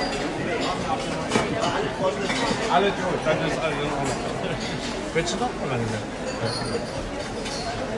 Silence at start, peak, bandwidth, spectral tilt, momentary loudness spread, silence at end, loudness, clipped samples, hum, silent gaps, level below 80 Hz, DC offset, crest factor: 0 s; -6 dBFS; 11.5 kHz; -4.5 dB/octave; 6 LU; 0 s; -26 LUFS; under 0.1%; none; none; -44 dBFS; under 0.1%; 20 dB